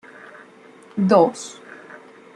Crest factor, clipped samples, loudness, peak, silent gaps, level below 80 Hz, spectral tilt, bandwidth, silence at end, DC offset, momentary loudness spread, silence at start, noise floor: 20 dB; under 0.1%; -18 LUFS; -2 dBFS; none; -70 dBFS; -6.5 dB/octave; 10.5 kHz; 0.85 s; under 0.1%; 26 LU; 0.95 s; -47 dBFS